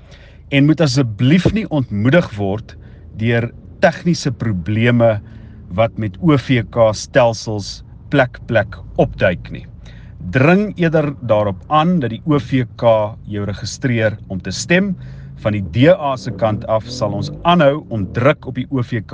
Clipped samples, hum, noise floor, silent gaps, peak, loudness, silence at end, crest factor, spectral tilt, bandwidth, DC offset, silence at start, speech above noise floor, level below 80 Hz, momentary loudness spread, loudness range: under 0.1%; none; -40 dBFS; none; 0 dBFS; -16 LUFS; 0 s; 16 dB; -6.5 dB/octave; 9.6 kHz; under 0.1%; 0.1 s; 24 dB; -40 dBFS; 11 LU; 2 LU